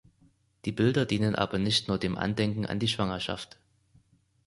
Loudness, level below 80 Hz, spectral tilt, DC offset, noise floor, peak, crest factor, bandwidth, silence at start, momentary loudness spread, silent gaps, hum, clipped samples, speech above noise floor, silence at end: -29 LUFS; -54 dBFS; -5.5 dB/octave; under 0.1%; -65 dBFS; -8 dBFS; 22 dB; 11.5 kHz; 0.65 s; 10 LU; none; none; under 0.1%; 37 dB; 1 s